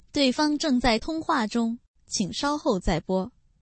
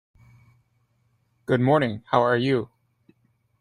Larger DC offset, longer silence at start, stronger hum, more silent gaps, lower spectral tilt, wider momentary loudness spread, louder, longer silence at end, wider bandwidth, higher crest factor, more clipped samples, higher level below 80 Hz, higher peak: neither; second, 0.15 s vs 1.5 s; neither; first, 1.88-1.94 s vs none; second, -4 dB/octave vs -8 dB/octave; second, 8 LU vs 13 LU; second, -26 LUFS vs -22 LUFS; second, 0.35 s vs 0.95 s; second, 8.8 kHz vs 10.5 kHz; second, 16 dB vs 22 dB; neither; first, -40 dBFS vs -62 dBFS; second, -10 dBFS vs -4 dBFS